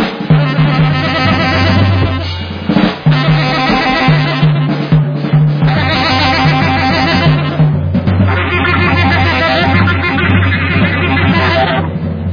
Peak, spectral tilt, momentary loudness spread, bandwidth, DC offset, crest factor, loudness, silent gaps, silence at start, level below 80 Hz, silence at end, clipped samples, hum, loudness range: 0 dBFS; -7.5 dB/octave; 3 LU; 5.2 kHz; under 0.1%; 10 dB; -11 LUFS; none; 0 s; -30 dBFS; 0 s; under 0.1%; none; 1 LU